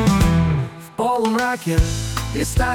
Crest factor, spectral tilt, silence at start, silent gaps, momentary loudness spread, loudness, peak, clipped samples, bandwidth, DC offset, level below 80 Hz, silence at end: 14 dB; -5.5 dB/octave; 0 s; none; 8 LU; -20 LUFS; -4 dBFS; under 0.1%; 18.5 kHz; under 0.1%; -26 dBFS; 0 s